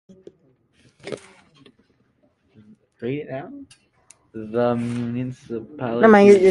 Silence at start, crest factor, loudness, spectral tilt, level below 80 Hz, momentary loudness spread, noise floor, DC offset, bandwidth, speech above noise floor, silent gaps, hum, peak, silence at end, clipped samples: 1.05 s; 22 dB; -19 LUFS; -7 dB/octave; -60 dBFS; 26 LU; -63 dBFS; under 0.1%; 11 kHz; 45 dB; none; none; 0 dBFS; 0 s; under 0.1%